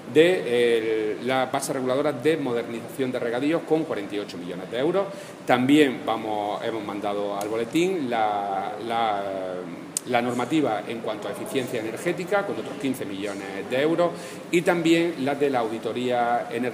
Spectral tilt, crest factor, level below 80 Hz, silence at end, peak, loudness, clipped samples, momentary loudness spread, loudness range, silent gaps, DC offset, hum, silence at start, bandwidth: -5 dB/octave; 22 dB; -74 dBFS; 0 s; -4 dBFS; -25 LUFS; under 0.1%; 10 LU; 3 LU; none; under 0.1%; none; 0 s; 15.5 kHz